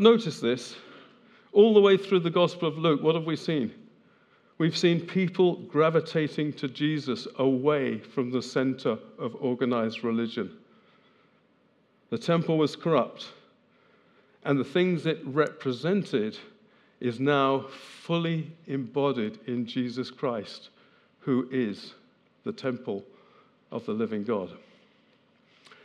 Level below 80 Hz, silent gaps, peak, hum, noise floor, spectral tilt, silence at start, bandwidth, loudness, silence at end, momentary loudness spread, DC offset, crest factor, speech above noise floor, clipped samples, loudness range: -86 dBFS; none; -4 dBFS; none; -65 dBFS; -6.5 dB/octave; 0 s; 10.5 kHz; -27 LUFS; 1.25 s; 13 LU; under 0.1%; 22 dB; 39 dB; under 0.1%; 9 LU